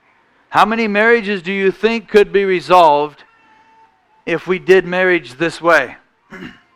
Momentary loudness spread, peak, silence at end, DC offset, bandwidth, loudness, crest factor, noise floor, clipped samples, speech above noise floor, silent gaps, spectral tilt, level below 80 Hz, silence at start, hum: 14 LU; 0 dBFS; 0.25 s; under 0.1%; 14 kHz; -14 LUFS; 16 dB; -55 dBFS; under 0.1%; 41 dB; none; -5.5 dB/octave; -50 dBFS; 0.5 s; none